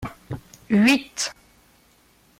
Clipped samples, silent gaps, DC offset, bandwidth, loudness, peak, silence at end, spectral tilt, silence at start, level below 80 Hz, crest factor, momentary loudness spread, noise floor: under 0.1%; none; under 0.1%; 16 kHz; -21 LUFS; -6 dBFS; 1.05 s; -4 dB/octave; 0 s; -54 dBFS; 18 dB; 20 LU; -58 dBFS